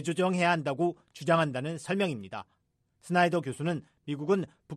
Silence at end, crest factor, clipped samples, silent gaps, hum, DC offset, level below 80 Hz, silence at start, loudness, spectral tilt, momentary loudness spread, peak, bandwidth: 0 s; 20 dB; under 0.1%; none; none; under 0.1%; -72 dBFS; 0 s; -30 LUFS; -6 dB/octave; 12 LU; -10 dBFS; 13 kHz